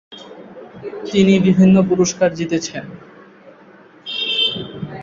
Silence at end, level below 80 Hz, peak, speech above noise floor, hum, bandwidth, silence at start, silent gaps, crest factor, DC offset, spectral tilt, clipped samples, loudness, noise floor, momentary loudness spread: 0 s; -54 dBFS; -2 dBFS; 30 dB; none; 7.6 kHz; 0.1 s; none; 16 dB; under 0.1%; -5.5 dB/octave; under 0.1%; -16 LUFS; -45 dBFS; 25 LU